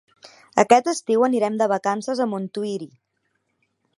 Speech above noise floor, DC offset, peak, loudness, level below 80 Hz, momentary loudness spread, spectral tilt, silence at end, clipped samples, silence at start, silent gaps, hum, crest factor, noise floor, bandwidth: 52 dB; under 0.1%; 0 dBFS; -21 LUFS; -70 dBFS; 12 LU; -4.5 dB/octave; 1.1 s; under 0.1%; 0.25 s; none; none; 22 dB; -72 dBFS; 11.5 kHz